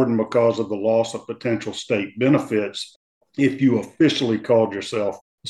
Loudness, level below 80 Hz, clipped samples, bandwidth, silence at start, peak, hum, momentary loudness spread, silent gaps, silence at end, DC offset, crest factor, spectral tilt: -21 LUFS; -66 dBFS; under 0.1%; 12 kHz; 0 s; -4 dBFS; none; 9 LU; 2.96-3.21 s, 5.21-5.38 s; 0 s; under 0.1%; 16 dB; -6 dB/octave